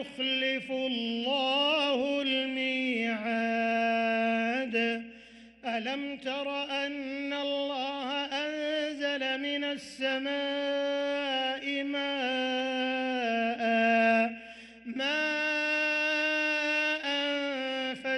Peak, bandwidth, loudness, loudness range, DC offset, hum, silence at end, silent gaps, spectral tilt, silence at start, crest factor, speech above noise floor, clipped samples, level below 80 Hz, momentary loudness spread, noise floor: -16 dBFS; 11.5 kHz; -29 LUFS; 5 LU; under 0.1%; none; 0 s; none; -3.5 dB/octave; 0 s; 16 dB; 22 dB; under 0.1%; -72 dBFS; 7 LU; -52 dBFS